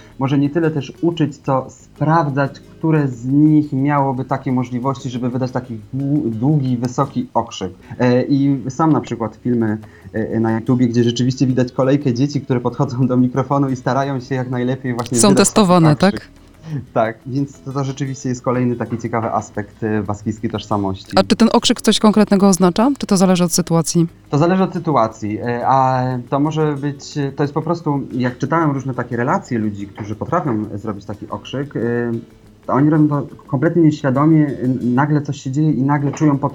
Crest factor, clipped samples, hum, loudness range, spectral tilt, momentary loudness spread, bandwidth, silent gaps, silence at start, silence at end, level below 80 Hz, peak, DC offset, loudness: 16 dB; under 0.1%; none; 6 LU; -6 dB/octave; 11 LU; 19.5 kHz; none; 0.2 s; 0 s; -50 dBFS; 0 dBFS; under 0.1%; -17 LUFS